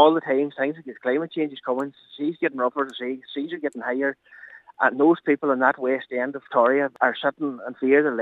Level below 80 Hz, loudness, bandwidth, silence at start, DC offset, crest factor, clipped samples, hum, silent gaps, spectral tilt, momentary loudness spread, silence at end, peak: -82 dBFS; -24 LUFS; 8 kHz; 0 s; under 0.1%; 20 dB; under 0.1%; none; none; -7 dB/octave; 11 LU; 0 s; -2 dBFS